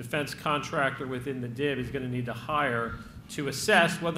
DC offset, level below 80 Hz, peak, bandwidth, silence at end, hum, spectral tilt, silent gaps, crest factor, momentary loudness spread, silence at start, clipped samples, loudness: under 0.1%; -54 dBFS; -8 dBFS; 16 kHz; 0 s; none; -4.5 dB/octave; none; 22 dB; 12 LU; 0 s; under 0.1%; -29 LUFS